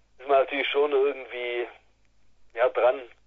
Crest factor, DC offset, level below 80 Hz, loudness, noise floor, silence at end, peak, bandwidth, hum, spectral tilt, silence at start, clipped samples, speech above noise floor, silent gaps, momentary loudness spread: 16 dB; under 0.1%; -68 dBFS; -25 LUFS; -59 dBFS; 0.2 s; -10 dBFS; 4.3 kHz; none; -5 dB/octave; 0.2 s; under 0.1%; 34 dB; none; 10 LU